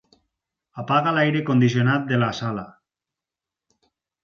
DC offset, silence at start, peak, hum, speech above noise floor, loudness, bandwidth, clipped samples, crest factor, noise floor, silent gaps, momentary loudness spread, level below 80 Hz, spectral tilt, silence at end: under 0.1%; 0.75 s; -6 dBFS; none; 68 dB; -21 LUFS; 7.2 kHz; under 0.1%; 18 dB; -88 dBFS; none; 17 LU; -62 dBFS; -7 dB/octave; 1.55 s